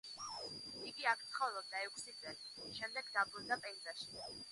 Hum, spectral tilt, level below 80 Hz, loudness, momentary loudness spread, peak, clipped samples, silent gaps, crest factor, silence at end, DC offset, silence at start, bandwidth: none; -1 dB/octave; -80 dBFS; -43 LUFS; 10 LU; -22 dBFS; under 0.1%; none; 24 dB; 0 s; under 0.1%; 0.05 s; 11.5 kHz